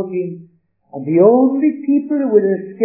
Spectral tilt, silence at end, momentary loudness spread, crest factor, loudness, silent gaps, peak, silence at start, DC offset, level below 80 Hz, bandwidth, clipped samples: -15.5 dB/octave; 0 s; 16 LU; 14 dB; -15 LUFS; none; 0 dBFS; 0 s; under 0.1%; -78 dBFS; 2.8 kHz; under 0.1%